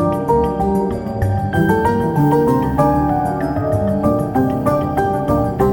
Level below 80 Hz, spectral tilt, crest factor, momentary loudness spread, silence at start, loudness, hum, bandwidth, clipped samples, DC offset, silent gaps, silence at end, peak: -32 dBFS; -8.5 dB/octave; 14 dB; 4 LU; 0 s; -17 LUFS; none; 17 kHz; under 0.1%; under 0.1%; none; 0 s; -2 dBFS